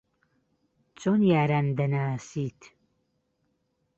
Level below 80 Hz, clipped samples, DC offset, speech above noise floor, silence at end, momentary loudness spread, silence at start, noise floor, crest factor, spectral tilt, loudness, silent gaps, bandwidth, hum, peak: -66 dBFS; under 0.1%; under 0.1%; 49 dB; 1.45 s; 12 LU; 1 s; -75 dBFS; 18 dB; -8 dB/octave; -26 LUFS; none; 8 kHz; none; -10 dBFS